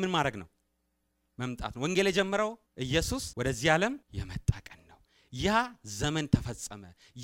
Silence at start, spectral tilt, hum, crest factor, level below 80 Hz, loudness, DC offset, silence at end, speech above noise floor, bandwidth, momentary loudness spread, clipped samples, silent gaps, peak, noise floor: 0 s; -4.5 dB/octave; none; 24 dB; -48 dBFS; -31 LUFS; under 0.1%; 0 s; 47 dB; 16 kHz; 14 LU; under 0.1%; none; -8 dBFS; -77 dBFS